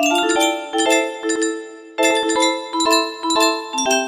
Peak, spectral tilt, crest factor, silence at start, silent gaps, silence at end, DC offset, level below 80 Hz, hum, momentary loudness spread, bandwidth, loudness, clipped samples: -2 dBFS; 0 dB/octave; 16 dB; 0 s; none; 0 s; under 0.1%; -62 dBFS; none; 5 LU; 15.5 kHz; -18 LUFS; under 0.1%